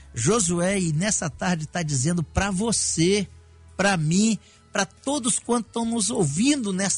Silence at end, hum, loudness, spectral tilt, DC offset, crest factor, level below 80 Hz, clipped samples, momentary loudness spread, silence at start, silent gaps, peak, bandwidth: 0 s; none; -23 LUFS; -4 dB/octave; under 0.1%; 16 dB; -46 dBFS; under 0.1%; 6 LU; 0 s; none; -8 dBFS; 11 kHz